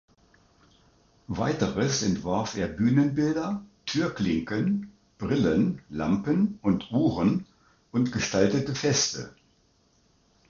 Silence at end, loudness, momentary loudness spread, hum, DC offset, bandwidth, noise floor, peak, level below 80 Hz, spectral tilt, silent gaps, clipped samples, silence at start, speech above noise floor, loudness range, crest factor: 1.2 s; -26 LUFS; 8 LU; none; under 0.1%; 7.6 kHz; -65 dBFS; -8 dBFS; -52 dBFS; -5 dB/octave; none; under 0.1%; 1.3 s; 40 dB; 2 LU; 20 dB